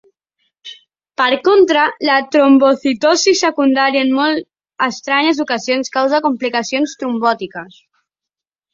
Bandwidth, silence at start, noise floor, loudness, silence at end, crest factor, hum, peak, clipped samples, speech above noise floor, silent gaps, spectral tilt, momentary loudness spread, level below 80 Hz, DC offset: 7.6 kHz; 0.65 s; -85 dBFS; -14 LUFS; 1.1 s; 14 dB; none; -2 dBFS; under 0.1%; 71 dB; none; -2.5 dB/octave; 12 LU; -62 dBFS; under 0.1%